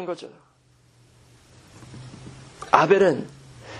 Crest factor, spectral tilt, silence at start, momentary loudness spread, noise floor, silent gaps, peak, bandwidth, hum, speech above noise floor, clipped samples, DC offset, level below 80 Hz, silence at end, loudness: 26 dB; -5.5 dB/octave; 0 s; 27 LU; -58 dBFS; none; 0 dBFS; 11.5 kHz; none; 37 dB; under 0.1%; under 0.1%; -60 dBFS; 0 s; -20 LUFS